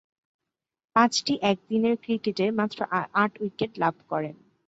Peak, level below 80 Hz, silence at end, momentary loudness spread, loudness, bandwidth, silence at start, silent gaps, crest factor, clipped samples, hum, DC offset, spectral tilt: -6 dBFS; -68 dBFS; 0.35 s; 9 LU; -26 LUFS; 8 kHz; 0.95 s; none; 22 dB; under 0.1%; none; under 0.1%; -4.5 dB/octave